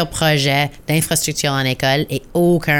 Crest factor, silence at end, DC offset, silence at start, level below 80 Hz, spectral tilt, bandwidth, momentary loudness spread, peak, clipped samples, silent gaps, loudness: 14 dB; 0 s; under 0.1%; 0 s; -42 dBFS; -4 dB/octave; 19.5 kHz; 4 LU; -4 dBFS; under 0.1%; none; -17 LUFS